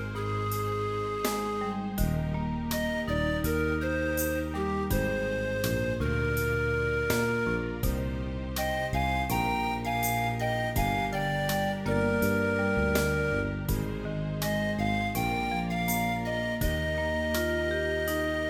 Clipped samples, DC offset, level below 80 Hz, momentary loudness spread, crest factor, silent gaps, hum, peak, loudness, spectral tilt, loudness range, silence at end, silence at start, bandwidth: under 0.1%; under 0.1%; -38 dBFS; 4 LU; 16 dB; none; none; -14 dBFS; -29 LUFS; -5.5 dB/octave; 2 LU; 0 s; 0 s; 19 kHz